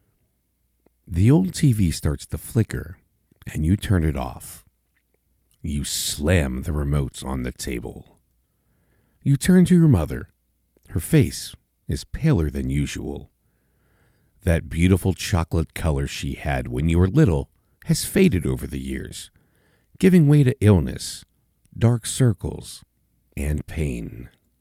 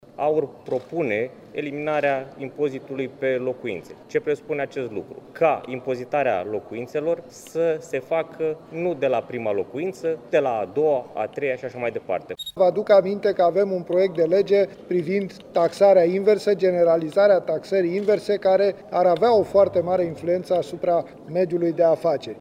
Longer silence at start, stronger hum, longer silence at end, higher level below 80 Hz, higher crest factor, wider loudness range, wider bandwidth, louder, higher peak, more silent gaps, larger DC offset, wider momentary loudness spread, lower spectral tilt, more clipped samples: first, 1.1 s vs 0.2 s; neither; first, 0.35 s vs 0 s; first, -34 dBFS vs -64 dBFS; about the same, 18 dB vs 16 dB; about the same, 6 LU vs 7 LU; first, 16 kHz vs 12 kHz; about the same, -22 LUFS vs -22 LUFS; about the same, -4 dBFS vs -6 dBFS; neither; neither; first, 19 LU vs 11 LU; about the same, -6.5 dB/octave vs -6.5 dB/octave; neither